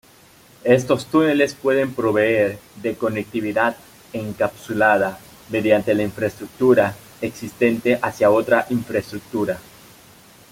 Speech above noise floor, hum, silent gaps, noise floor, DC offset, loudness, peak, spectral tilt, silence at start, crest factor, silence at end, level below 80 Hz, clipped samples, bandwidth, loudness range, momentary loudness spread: 30 dB; none; none; -50 dBFS; under 0.1%; -20 LUFS; -2 dBFS; -6 dB/octave; 0.65 s; 18 dB; 0.9 s; -56 dBFS; under 0.1%; 16.5 kHz; 2 LU; 12 LU